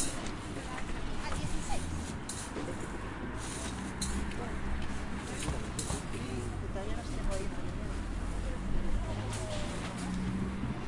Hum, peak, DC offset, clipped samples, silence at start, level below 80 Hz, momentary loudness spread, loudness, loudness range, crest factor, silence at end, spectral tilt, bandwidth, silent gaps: none; -18 dBFS; under 0.1%; under 0.1%; 0 s; -40 dBFS; 4 LU; -38 LUFS; 1 LU; 16 dB; 0 s; -4.5 dB/octave; 11.5 kHz; none